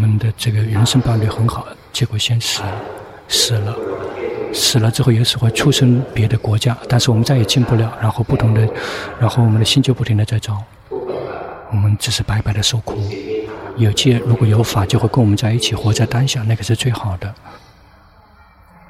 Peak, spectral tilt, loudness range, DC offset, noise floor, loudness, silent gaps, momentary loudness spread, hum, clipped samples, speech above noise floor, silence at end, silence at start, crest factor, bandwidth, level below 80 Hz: -2 dBFS; -5 dB/octave; 4 LU; under 0.1%; -46 dBFS; -16 LUFS; none; 11 LU; none; under 0.1%; 31 dB; 1.35 s; 0 s; 14 dB; 15 kHz; -40 dBFS